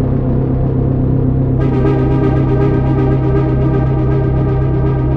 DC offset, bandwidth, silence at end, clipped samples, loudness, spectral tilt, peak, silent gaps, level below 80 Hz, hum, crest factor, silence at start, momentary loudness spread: under 0.1%; 3.9 kHz; 0 s; under 0.1%; -14 LUFS; -11.5 dB/octave; -2 dBFS; none; -20 dBFS; none; 10 dB; 0 s; 2 LU